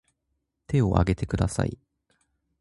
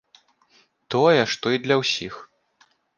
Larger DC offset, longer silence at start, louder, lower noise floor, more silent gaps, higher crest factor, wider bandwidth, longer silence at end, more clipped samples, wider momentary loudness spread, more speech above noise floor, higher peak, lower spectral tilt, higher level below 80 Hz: neither; second, 0.7 s vs 0.9 s; second, -26 LUFS vs -21 LUFS; first, -78 dBFS vs -62 dBFS; neither; about the same, 24 dB vs 20 dB; first, 11.5 kHz vs 9.6 kHz; about the same, 0.85 s vs 0.75 s; neither; second, 8 LU vs 14 LU; first, 54 dB vs 41 dB; about the same, -2 dBFS vs -4 dBFS; first, -7 dB/octave vs -4.5 dB/octave; first, -38 dBFS vs -66 dBFS